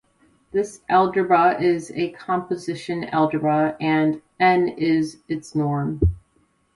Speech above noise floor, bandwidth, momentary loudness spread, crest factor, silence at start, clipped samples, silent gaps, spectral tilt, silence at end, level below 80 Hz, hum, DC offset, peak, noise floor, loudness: 43 dB; 11.5 kHz; 10 LU; 16 dB; 0.55 s; under 0.1%; none; -7 dB/octave; 0.55 s; -38 dBFS; none; under 0.1%; -4 dBFS; -64 dBFS; -21 LUFS